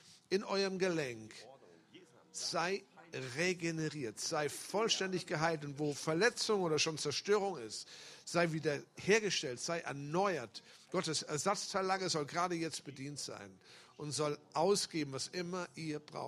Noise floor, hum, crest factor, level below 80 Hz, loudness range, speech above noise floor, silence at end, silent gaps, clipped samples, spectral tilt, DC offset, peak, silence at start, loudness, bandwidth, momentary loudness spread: -62 dBFS; none; 22 dB; -78 dBFS; 4 LU; 25 dB; 0 s; none; under 0.1%; -3.5 dB/octave; under 0.1%; -16 dBFS; 0.05 s; -37 LUFS; 15 kHz; 13 LU